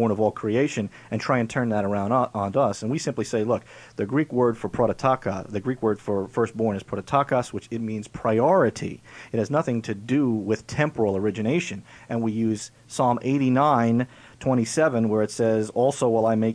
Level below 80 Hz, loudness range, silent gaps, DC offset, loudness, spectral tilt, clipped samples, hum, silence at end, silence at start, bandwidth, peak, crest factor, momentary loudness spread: -58 dBFS; 3 LU; none; under 0.1%; -24 LUFS; -6.5 dB/octave; under 0.1%; none; 0 s; 0 s; 11 kHz; -6 dBFS; 18 dB; 10 LU